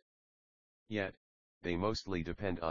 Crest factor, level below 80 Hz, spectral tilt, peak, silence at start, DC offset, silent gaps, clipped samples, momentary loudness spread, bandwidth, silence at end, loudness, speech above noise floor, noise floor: 20 dB; -58 dBFS; -4.5 dB/octave; -20 dBFS; 0 s; under 0.1%; 0.02-0.86 s, 1.17-1.61 s; under 0.1%; 6 LU; 7 kHz; 0 s; -39 LUFS; over 53 dB; under -90 dBFS